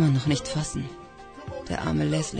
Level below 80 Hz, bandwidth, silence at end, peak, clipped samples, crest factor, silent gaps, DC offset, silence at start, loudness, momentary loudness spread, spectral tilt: -46 dBFS; 9.4 kHz; 0 s; -12 dBFS; under 0.1%; 16 dB; none; under 0.1%; 0 s; -28 LUFS; 18 LU; -5.5 dB/octave